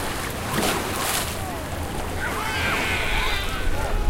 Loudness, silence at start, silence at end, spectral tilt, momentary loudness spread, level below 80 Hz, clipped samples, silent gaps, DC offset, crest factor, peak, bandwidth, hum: -25 LUFS; 0 s; 0 s; -3.5 dB/octave; 7 LU; -30 dBFS; under 0.1%; none; under 0.1%; 18 dB; -6 dBFS; 17 kHz; none